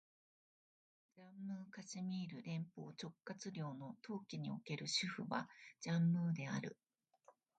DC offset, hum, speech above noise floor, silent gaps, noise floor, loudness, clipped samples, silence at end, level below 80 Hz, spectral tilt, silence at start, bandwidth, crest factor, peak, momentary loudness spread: under 0.1%; none; 28 dB; none; -73 dBFS; -45 LUFS; under 0.1%; 0.25 s; -88 dBFS; -5 dB/octave; 1.15 s; 9 kHz; 20 dB; -26 dBFS; 14 LU